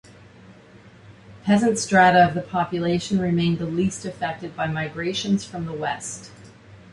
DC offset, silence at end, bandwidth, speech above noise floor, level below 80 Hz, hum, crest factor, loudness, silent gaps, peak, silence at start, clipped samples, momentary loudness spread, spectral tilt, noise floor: under 0.1%; 0.15 s; 11.5 kHz; 26 dB; -54 dBFS; none; 18 dB; -22 LUFS; none; -4 dBFS; 0.5 s; under 0.1%; 13 LU; -5 dB/octave; -48 dBFS